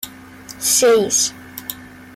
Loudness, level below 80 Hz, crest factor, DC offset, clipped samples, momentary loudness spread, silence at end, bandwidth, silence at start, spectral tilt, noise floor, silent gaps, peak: -15 LUFS; -58 dBFS; 16 dB; under 0.1%; under 0.1%; 21 LU; 0.05 s; 16.5 kHz; 0.05 s; -1 dB/octave; -38 dBFS; none; -4 dBFS